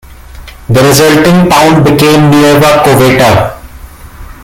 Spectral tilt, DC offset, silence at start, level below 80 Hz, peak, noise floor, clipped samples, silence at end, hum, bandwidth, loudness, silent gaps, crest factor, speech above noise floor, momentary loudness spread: -5 dB/octave; under 0.1%; 0.1 s; -30 dBFS; 0 dBFS; -28 dBFS; 0.6%; 0.1 s; none; over 20 kHz; -5 LUFS; none; 6 dB; 24 dB; 6 LU